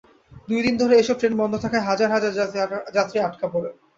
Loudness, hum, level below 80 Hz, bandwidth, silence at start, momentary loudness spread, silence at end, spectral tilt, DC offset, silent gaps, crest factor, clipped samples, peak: -22 LUFS; none; -56 dBFS; 7.8 kHz; 0.3 s; 9 LU; 0.25 s; -5 dB/octave; under 0.1%; none; 16 dB; under 0.1%; -6 dBFS